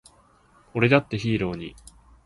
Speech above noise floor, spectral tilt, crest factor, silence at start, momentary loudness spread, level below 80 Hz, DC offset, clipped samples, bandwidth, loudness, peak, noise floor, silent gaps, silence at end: 35 dB; -7 dB/octave; 22 dB; 0.75 s; 16 LU; -52 dBFS; under 0.1%; under 0.1%; 11.5 kHz; -23 LUFS; -4 dBFS; -58 dBFS; none; 0.35 s